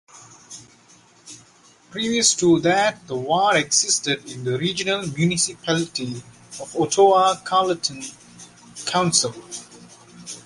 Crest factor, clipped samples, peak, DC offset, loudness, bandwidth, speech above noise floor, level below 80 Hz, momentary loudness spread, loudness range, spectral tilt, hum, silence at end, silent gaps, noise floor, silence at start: 20 dB; under 0.1%; -2 dBFS; under 0.1%; -20 LUFS; 11.5 kHz; 32 dB; -60 dBFS; 20 LU; 3 LU; -3 dB/octave; none; 0.05 s; none; -53 dBFS; 0.15 s